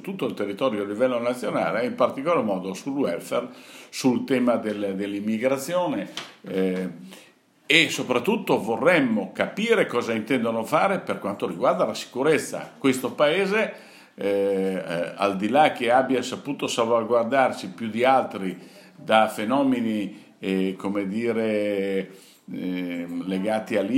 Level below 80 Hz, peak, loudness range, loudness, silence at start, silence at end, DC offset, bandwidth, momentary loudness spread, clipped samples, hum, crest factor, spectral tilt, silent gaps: -76 dBFS; 0 dBFS; 4 LU; -24 LUFS; 0.05 s; 0 s; under 0.1%; 16 kHz; 10 LU; under 0.1%; none; 24 dB; -5 dB/octave; none